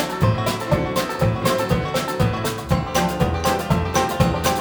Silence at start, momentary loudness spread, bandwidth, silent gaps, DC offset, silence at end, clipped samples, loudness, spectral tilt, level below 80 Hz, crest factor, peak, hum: 0 s; 3 LU; over 20 kHz; none; under 0.1%; 0 s; under 0.1%; -21 LUFS; -5.5 dB/octave; -34 dBFS; 16 dB; -4 dBFS; none